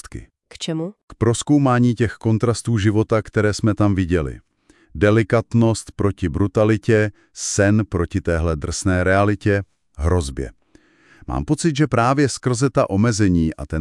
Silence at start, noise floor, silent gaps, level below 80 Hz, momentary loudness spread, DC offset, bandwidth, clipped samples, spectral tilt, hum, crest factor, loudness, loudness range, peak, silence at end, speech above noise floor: 0.05 s; -55 dBFS; 1.03-1.08 s; -38 dBFS; 11 LU; under 0.1%; 12 kHz; under 0.1%; -6 dB/octave; none; 16 dB; -19 LUFS; 3 LU; -4 dBFS; 0 s; 37 dB